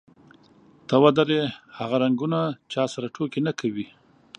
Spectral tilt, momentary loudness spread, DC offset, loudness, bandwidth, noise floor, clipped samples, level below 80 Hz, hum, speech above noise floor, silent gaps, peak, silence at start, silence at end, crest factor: -6.5 dB/octave; 15 LU; under 0.1%; -24 LUFS; 10 kHz; -55 dBFS; under 0.1%; -70 dBFS; none; 32 dB; none; -2 dBFS; 0.9 s; 0.55 s; 22 dB